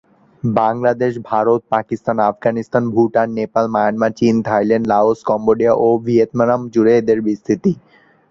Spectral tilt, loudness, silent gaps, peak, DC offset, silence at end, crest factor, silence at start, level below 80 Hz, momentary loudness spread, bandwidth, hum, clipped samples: -8 dB/octave; -16 LUFS; none; -2 dBFS; under 0.1%; 0.55 s; 14 dB; 0.45 s; -54 dBFS; 6 LU; 7.4 kHz; none; under 0.1%